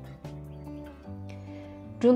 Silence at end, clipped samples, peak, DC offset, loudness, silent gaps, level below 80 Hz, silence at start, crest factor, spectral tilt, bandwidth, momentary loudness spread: 0 s; under 0.1%; -10 dBFS; under 0.1%; -38 LUFS; none; -54 dBFS; 0 s; 20 dB; -8 dB/octave; 9.6 kHz; 4 LU